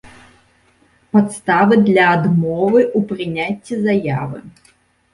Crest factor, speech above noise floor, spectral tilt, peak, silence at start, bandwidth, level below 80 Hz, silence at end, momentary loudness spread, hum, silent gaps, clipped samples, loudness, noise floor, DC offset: 16 dB; 40 dB; -7 dB/octave; -2 dBFS; 0.05 s; 11.5 kHz; -54 dBFS; 0.65 s; 10 LU; none; none; under 0.1%; -15 LUFS; -55 dBFS; under 0.1%